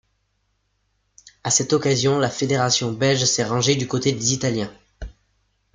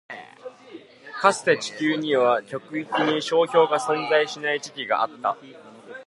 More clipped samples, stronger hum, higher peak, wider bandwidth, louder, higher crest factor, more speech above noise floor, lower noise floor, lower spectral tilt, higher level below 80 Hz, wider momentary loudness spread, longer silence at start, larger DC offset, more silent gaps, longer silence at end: neither; first, 50 Hz at -50 dBFS vs none; second, -6 dBFS vs -2 dBFS; second, 9.8 kHz vs 11.5 kHz; first, -20 LUFS vs -23 LUFS; about the same, 18 dB vs 22 dB; first, 49 dB vs 22 dB; first, -70 dBFS vs -45 dBFS; about the same, -3.5 dB/octave vs -3.5 dB/octave; first, -48 dBFS vs -78 dBFS; second, 15 LU vs 20 LU; first, 1.25 s vs 0.1 s; neither; neither; first, 0.65 s vs 0.05 s